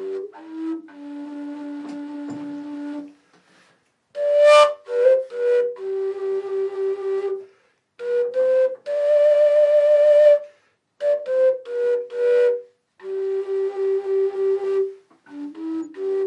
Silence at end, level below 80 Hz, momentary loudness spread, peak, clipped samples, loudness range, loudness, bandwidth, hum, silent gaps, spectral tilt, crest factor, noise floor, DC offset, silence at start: 0 s; under -90 dBFS; 18 LU; -4 dBFS; under 0.1%; 14 LU; -20 LUFS; 11 kHz; none; none; -3.5 dB/octave; 16 dB; -62 dBFS; under 0.1%; 0 s